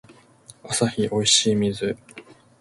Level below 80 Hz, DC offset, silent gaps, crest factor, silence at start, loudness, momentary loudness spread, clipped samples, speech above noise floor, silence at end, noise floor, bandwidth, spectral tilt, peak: -56 dBFS; under 0.1%; none; 20 dB; 0.1 s; -21 LUFS; 12 LU; under 0.1%; 29 dB; 0.4 s; -50 dBFS; 11.5 kHz; -3 dB/octave; -4 dBFS